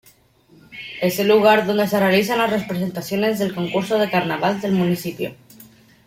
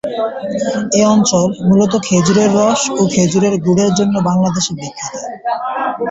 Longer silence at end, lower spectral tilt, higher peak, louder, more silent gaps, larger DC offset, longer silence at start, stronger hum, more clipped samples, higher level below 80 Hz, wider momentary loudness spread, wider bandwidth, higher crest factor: first, 0.4 s vs 0 s; about the same, -5.5 dB/octave vs -5 dB/octave; about the same, -2 dBFS vs -2 dBFS; second, -19 LUFS vs -14 LUFS; neither; neither; first, 0.7 s vs 0.05 s; neither; neither; second, -60 dBFS vs -48 dBFS; first, 13 LU vs 9 LU; first, 16.5 kHz vs 8 kHz; first, 18 dB vs 12 dB